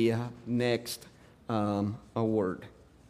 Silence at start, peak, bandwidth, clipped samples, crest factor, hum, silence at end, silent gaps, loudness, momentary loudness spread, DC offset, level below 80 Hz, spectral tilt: 0 s; -14 dBFS; 15.5 kHz; under 0.1%; 18 dB; none; 0.4 s; none; -32 LUFS; 13 LU; under 0.1%; -64 dBFS; -6.5 dB/octave